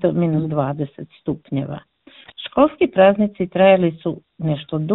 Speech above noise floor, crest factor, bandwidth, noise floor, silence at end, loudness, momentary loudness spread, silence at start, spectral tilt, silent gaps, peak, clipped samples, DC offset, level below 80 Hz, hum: 24 dB; 18 dB; 4.1 kHz; -42 dBFS; 0 s; -19 LUFS; 15 LU; 0 s; -12 dB/octave; none; 0 dBFS; under 0.1%; under 0.1%; -52 dBFS; none